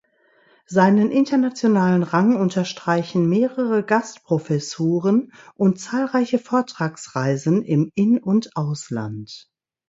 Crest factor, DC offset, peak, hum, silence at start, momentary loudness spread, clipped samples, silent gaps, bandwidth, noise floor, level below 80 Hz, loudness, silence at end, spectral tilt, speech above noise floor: 18 dB; under 0.1%; -2 dBFS; none; 0.7 s; 9 LU; under 0.1%; none; 8 kHz; -59 dBFS; -64 dBFS; -20 LUFS; 0.5 s; -7 dB/octave; 39 dB